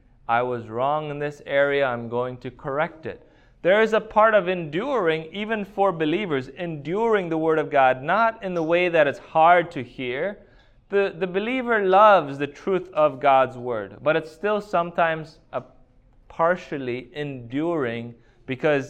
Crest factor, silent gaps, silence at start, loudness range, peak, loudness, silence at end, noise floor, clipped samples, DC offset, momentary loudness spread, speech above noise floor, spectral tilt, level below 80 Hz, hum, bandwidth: 20 dB; none; 0.3 s; 6 LU; -4 dBFS; -22 LUFS; 0 s; -54 dBFS; under 0.1%; under 0.1%; 13 LU; 32 dB; -6.5 dB/octave; -56 dBFS; none; 8.8 kHz